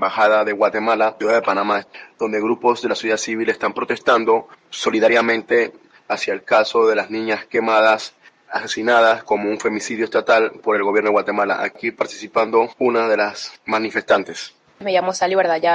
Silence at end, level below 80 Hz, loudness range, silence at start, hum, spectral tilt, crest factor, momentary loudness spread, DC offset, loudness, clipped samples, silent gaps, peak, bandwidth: 0 s; -66 dBFS; 2 LU; 0 s; none; -3.5 dB/octave; 18 dB; 9 LU; under 0.1%; -18 LUFS; under 0.1%; none; 0 dBFS; 9.6 kHz